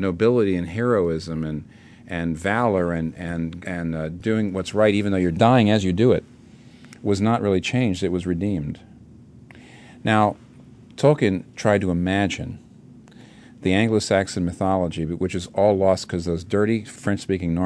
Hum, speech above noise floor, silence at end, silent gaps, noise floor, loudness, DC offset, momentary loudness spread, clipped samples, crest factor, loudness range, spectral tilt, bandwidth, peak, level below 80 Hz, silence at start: none; 26 dB; 0 s; none; -47 dBFS; -22 LUFS; under 0.1%; 10 LU; under 0.1%; 20 dB; 4 LU; -6.5 dB/octave; 11 kHz; -2 dBFS; -48 dBFS; 0 s